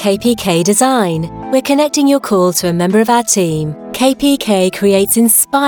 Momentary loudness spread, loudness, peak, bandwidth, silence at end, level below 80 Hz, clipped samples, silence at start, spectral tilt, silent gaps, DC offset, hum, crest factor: 7 LU; -12 LUFS; 0 dBFS; 19.5 kHz; 0 s; -44 dBFS; under 0.1%; 0 s; -4 dB/octave; none; under 0.1%; none; 12 dB